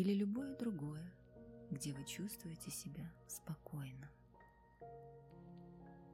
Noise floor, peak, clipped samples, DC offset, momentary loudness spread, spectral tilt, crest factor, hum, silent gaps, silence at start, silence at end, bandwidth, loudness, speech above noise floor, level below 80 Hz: -66 dBFS; -26 dBFS; under 0.1%; under 0.1%; 17 LU; -5.5 dB/octave; 20 dB; none; none; 0 s; 0 s; 16 kHz; -47 LUFS; 22 dB; -70 dBFS